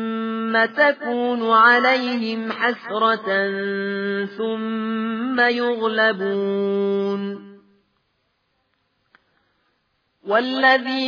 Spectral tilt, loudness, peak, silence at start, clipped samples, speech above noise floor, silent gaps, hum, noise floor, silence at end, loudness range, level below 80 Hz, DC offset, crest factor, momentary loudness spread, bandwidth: -6.5 dB/octave; -20 LUFS; -4 dBFS; 0 s; under 0.1%; 50 dB; none; none; -69 dBFS; 0 s; 11 LU; -78 dBFS; under 0.1%; 18 dB; 9 LU; 5.2 kHz